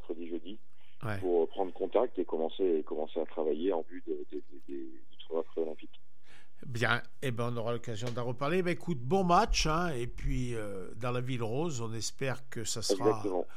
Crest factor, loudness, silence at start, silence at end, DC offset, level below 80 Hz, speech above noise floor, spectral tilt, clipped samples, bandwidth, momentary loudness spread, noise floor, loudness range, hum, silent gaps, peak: 22 dB; -33 LUFS; 0.1 s; 0.1 s; 2%; -46 dBFS; 30 dB; -5 dB/octave; under 0.1%; 15.5 kHz; 14 LU; -63 dBFS; 6 LU; none; none; -12 dBFS